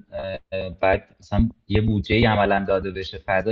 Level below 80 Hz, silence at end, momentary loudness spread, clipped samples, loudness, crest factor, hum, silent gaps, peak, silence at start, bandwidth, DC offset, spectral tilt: -34 dBFS; 0 s; 12 LU; under 0.1%; -23 LUFS; 18 dB; none; none; -4 dBFS; 0.1 s; 6.8 kHz; under 0.1%; -8 dB/octave